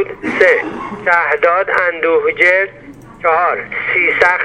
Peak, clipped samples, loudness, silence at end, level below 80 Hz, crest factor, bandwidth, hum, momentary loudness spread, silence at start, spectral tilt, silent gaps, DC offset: 0 dBFS; under 0.1%; -13 LUFS; 0 s; -50 dBFS; 14 dB; 10 kHz; none; 8 LU; 0 s; -4.5 dB/octave; none; under 0.1%